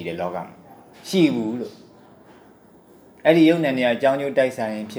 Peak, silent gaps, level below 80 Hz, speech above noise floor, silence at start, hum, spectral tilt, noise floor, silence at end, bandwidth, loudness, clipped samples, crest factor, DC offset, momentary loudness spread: -2 dBFS; none; -70 dBFS; 30 dB; 0 s; none; -6 dB/octave; -50 dBFS; 0 s; over 20 kHz; -20 LUFS; under 0.1%; 20 dB; under 0.1%; 18 LU